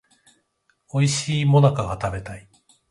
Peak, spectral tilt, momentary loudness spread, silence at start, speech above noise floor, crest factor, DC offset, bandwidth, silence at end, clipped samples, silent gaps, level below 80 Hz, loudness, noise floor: -4 dBFS; -5.5 dB/octave; 18 LU; 0.95 s; 48 dB; 18 dB; under 0.1%; 11.5 kHz; 0.5 s; under 0.1%; none; -46 dBFS; -21 LUFS; -68 dBFS